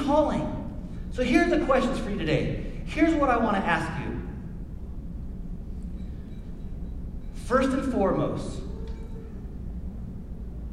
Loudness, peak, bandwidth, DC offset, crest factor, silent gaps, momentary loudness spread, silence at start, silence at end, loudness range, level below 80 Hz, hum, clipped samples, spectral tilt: -27 LUFS; -8 dBFS; 12.5 kHz; under 0.1%; 20 dB; none; 17 LU; 0 s; 0 s; 10 LU; -36 dBFS; none; under 0.1%; -6.5 dB/octave